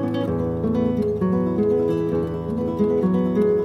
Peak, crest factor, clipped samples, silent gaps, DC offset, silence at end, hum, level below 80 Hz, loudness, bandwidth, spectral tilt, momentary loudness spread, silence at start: -8 dBFS; 12 dB; under 0.1%; none; under 0.1%; 0 s; none; -44 dBFS; -22 LUFS; 11.5 kHz; -10 dB/octave; 5 LU; 0 s